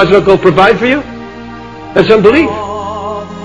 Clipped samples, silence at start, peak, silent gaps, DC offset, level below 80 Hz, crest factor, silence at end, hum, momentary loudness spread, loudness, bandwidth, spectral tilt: 3%; 0 s; 0 dBFS; none; 0.5%; -36 dBFS; 10 dB; 0 s; none; 20 LU; -9 LUFS; 9.8 kHz; -6.5 dB/octave